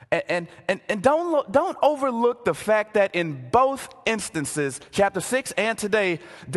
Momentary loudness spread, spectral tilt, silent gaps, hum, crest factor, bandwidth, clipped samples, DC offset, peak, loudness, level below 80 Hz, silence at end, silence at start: 7 LU; -4 dB/octave; none; none; 18 dB; 12.5 kHz; under 0.1%; under 0.1%; -4 dBFS; -23 LUFS; -56 dBFS; 0 s; 0.1 s